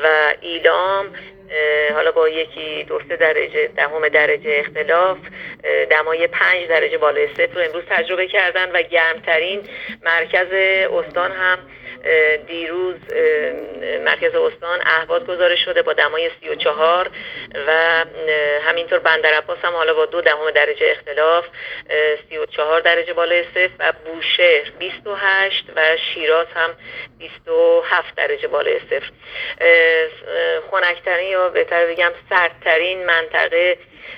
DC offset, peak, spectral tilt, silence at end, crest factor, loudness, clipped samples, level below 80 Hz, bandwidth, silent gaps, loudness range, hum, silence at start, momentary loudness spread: under 0.1%; 0 dBFS; -4.5 dB/octave; 0 s; 18 dB; -17 LUFS; under 0.1%; -58 dBFS; 5.4 kHz; none; 2 LU; none; 0 s; 10 LU